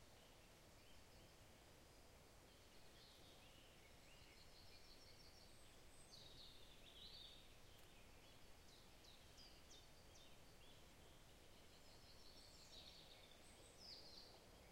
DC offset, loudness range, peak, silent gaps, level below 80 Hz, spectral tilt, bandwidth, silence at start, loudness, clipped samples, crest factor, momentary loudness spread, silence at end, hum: under 0.1%; 4 LU; -48 dBFS; none; -72 dBFS; -3 dB/octave; 16 kHz; 0 s; -65 LUFS; under 0.1%; 18 dB; 7 LU; 0 s; none